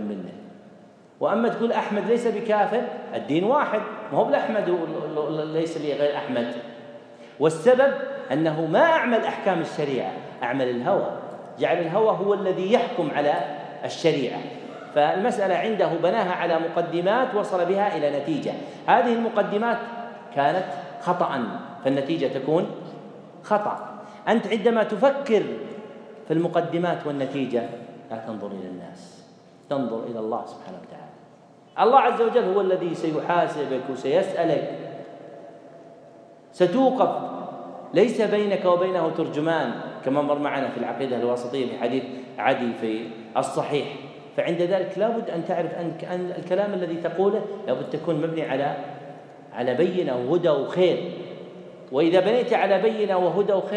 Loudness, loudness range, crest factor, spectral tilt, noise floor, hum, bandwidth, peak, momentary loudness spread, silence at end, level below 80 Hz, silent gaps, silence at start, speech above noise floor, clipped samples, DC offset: -24 LUFS; 4 LU; 20 dB; -6.5 dB/octave; -51 dBFS; none; 10.5 kHz; -4 dBFS; 16 LU; 0 s; -82 dBFS; none; 0 s; 28 dB; under 0.1%; under 0.1%